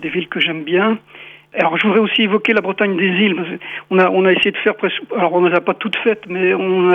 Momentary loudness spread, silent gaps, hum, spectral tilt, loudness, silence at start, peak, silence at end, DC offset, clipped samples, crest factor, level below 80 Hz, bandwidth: 7 LU; none; none; -7 dB/octave; -16 LUFS; 0 s; -2 dBFS; 0 s; under 0.1%; under 0.1%; 14 dB; -64 dBFS; 5.8 kHz